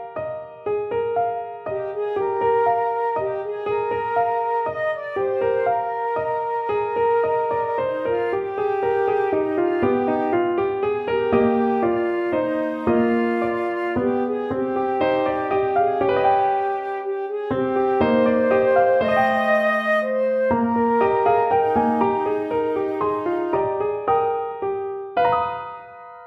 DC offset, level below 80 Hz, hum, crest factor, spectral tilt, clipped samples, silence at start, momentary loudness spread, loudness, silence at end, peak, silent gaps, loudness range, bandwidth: under 0.1%; -54 dBFS; none; 16 dB; -8 dB/octave; under 0.1%; 0 s; 8 LU; -21 LUFS; 0 s; -6 dBFS; none; 4 LU; 6 kHz